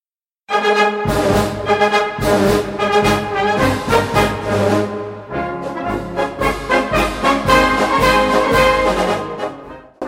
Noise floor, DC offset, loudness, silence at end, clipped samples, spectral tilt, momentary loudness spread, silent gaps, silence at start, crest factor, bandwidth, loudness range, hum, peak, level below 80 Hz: -47 dBFS; under 0.1%; -16 LUFS; 0 s; under 0.1%; -5 dB/octave; 11 LU; none; 0.5 s; 16 dB; 16.5 kHz; 4 LU; none; 0 dBFS; -32 dBFS